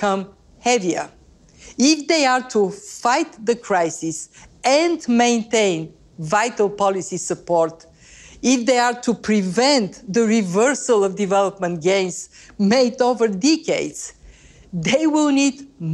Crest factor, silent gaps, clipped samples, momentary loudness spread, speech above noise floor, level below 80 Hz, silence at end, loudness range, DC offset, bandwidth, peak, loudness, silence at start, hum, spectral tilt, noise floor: 16 dB; none; under 0.1%; 11 LU; 27 dB; -56 dBFS; 0 s; 2 LU; under 0.1%; 12.5 kHz; -4 dBFS; -19 LUFS; 0 s; none; -4 dB/octave; -46 dBFS